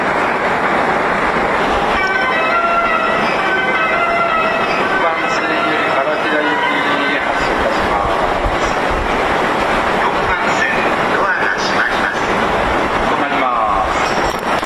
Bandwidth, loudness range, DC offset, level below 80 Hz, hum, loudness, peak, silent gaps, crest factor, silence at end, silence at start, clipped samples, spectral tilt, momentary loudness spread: 14 kHz; 1 LU; under 0.1%; -34 dBFS; none; -14 LUFS; -4 dBFS; none; 12 dB; 0 s; 0 s; under 0.1%; -4 dB/octave; 2 LU